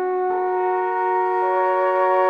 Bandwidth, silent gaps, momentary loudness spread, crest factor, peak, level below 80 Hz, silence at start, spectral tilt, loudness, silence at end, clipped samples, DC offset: 4.9 kHz; none; 3 LU; 12 dB; -8 dBFS; -74 dBFS; 0 s; -5.5 dB/octave; -20 LUFS; 0 s; under 0.1%; under 0.1%